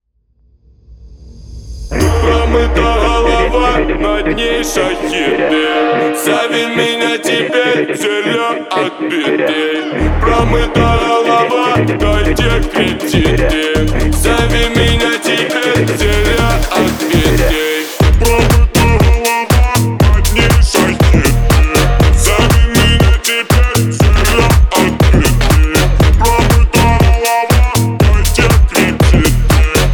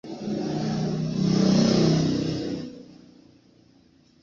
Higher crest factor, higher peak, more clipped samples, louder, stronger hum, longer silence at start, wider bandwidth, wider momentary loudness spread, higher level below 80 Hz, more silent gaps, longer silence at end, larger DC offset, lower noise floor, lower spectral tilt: second, 10 dB vs 16 dB; first, 0 dBFS vs -10 dBFS; neither; first, -11 LUFS vs -24 LUFS; neither; first, 0.9 s vs 0.05 s; first, over 20 kHz vs 7.6 kHz; second, 4 LU vs 13 LU; first, -14 dBFS vs -52 dBFS; neither; second, 0 s vs 1.3 s; neither; second, -53 dBFS vs -58 dBFS; second, -5 dB/octave vs -6.5 dB/octave